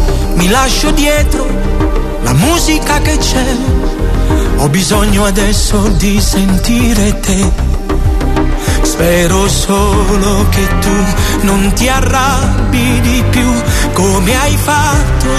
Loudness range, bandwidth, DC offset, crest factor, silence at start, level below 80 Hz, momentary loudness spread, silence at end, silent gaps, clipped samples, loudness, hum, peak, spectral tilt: 1 LU; 14 kHz; under 0.1%; 10 dB; 0 s; -14 dBFS; 4 LU; 0 s; none; under 0.1%; -11 LUFS; none; 0 dBFS; -4.5 dB/octave